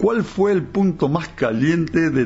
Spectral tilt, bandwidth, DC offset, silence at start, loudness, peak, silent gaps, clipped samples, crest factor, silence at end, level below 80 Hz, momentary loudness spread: -7.5 dB/octave; 8 kHz; under 0.1%; 0 s; -19 LUFS; -6 dBFS; none; under 0.1%; 12 dB; 0 s; -46 dBFS; 3 LU